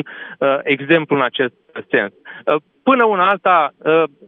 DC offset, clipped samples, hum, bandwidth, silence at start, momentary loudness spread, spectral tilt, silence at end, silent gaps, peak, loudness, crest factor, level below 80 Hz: under 0.1%; under 0.1%; none; 4.1 kHz; 0 s; 9 LU; -8 dB/octave; 0.2 s; none; 0 dBFS; -16 LUFS; 16 dB; -76 dBFS